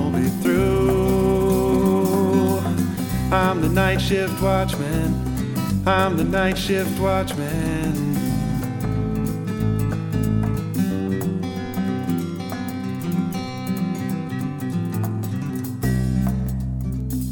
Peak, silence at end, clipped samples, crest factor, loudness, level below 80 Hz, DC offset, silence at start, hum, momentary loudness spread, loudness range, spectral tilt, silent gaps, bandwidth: -4 dBFS; 0 s; under 0.1%; 18 dB; -22 LUFS; -34 dBFS; under 0.1%; 0 s; none; 8 LU; 6 LU; -6.5 dB/octave; none; 18 kHz